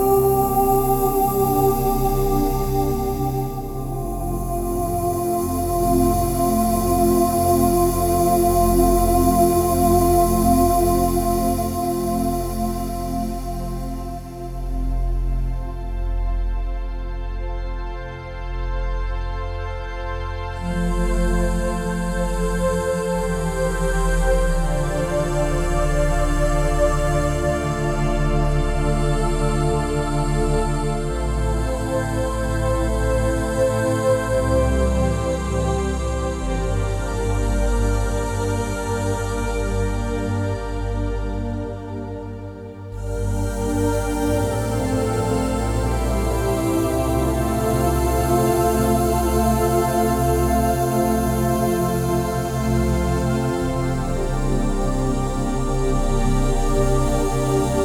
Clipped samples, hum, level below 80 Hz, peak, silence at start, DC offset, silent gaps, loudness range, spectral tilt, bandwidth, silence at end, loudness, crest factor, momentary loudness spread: under 0.1%; none; -24 dBFS; -4 dBFS; 0 s; under 0.1%; none; 10 LU; -6 dB/octave; 18.5 kHz; 0 s; -21 LUFS; 16 dB; 11 LU